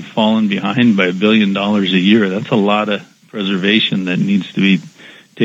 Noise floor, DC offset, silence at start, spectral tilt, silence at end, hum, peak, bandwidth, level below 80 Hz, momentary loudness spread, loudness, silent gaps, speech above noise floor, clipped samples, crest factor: -40 dBFS; under 0.1%; 0 s; -6.5 dB/octave; 0 s; none; 0 dBFS; 7.8 kHz; -70 dBFS; 6 LU; -14 LUFS; none; 26 dB; under 0.1%; 14 dB